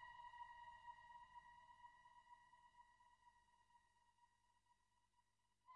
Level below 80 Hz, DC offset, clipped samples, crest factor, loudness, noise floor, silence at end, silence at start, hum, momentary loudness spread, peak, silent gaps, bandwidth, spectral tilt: -86 dBFS; under 0.1%; under 0.1%; 18 dB; -63 LUFS; -86 dBFS; 0 s; 0 s; 50 Hz at -95 dBFS; 10 LU; -48 dBFS; none; 9.6 kHz; -2 dB/octave